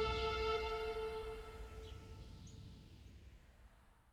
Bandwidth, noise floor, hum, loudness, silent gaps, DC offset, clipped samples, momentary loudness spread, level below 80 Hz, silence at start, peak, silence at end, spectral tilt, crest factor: 15.5 kHz; -65 dBFS; none; -43 LUFS; none; under 0.1%; under 0.1%; 22 LU; -54 dBFS; 0 s; -28 dBFS; 0 s; -4.5 dB/octave; 18 dB